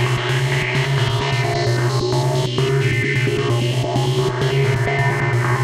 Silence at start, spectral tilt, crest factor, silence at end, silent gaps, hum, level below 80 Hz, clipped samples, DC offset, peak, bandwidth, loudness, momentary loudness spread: 0 s; -5.5 dB/octave; 12 dB; 0 s; none; none; -42 dBFS; under 0.1%; under 0.1%; -6 dBFS; 14 kHz; -18 LUFS; 1 LU